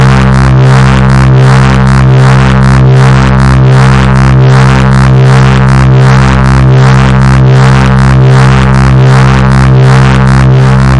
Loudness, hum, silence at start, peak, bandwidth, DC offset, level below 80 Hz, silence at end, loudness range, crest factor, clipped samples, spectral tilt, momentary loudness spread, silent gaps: -4 LUFS; none; 0 s; 0 dBFS; 10.5 kHz; 8%; -12 dBFS; 0 s; 0 LU; 2 dB; 2%; -7 dB/octave; 1 LU; none